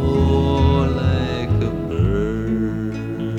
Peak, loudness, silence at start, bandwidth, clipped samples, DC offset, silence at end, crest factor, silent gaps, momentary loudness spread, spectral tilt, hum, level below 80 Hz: -2 dBFS; -20 LUFS; 0 s; 8 kHz; under 0.1%; under 0.1%; 0 s; 16 dB; none; 7 LU; -8.5 dB/octave; none; -28 dBFS